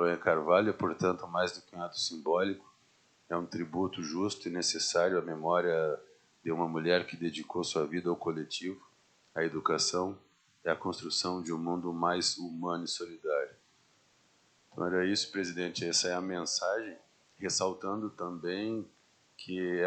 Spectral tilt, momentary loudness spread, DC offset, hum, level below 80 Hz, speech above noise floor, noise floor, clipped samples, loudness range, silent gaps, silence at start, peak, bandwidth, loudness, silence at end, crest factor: -3.5 dB/octave; 10 LU; under 0.1%; none; -76 dBFS; 35 dB; -68 dBFS; under 0.1%; 4 LU; none; 0 s; -12 dBFS; 9.2 kHz; -33 LUFS; 0 s; 22 dB